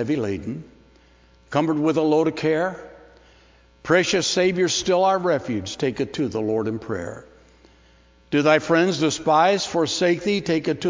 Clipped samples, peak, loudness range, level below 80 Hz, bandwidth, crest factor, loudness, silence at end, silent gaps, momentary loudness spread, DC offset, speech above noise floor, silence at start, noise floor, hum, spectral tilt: under 0.1%; -2 dBFS; 4 LU; -54 dBFS; 7.6 kHz; 20 dB; -21 LUFS; 0 s; none; 12 LU; under 0.1%; 33 dB; 0 s; -54 dBFS; none; -4.5 dB/octave